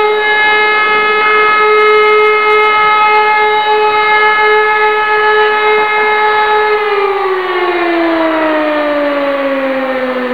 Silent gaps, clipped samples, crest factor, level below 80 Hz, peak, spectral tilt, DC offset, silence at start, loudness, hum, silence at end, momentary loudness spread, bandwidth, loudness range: none; under 0.1%; 10 dB; -50 dBFS; 0 dBFS; -4.5 dB/octave; 1%; 0 s; -9 LUFS; none; 0 s; 6 LU; 5.2 kHz; 4 LU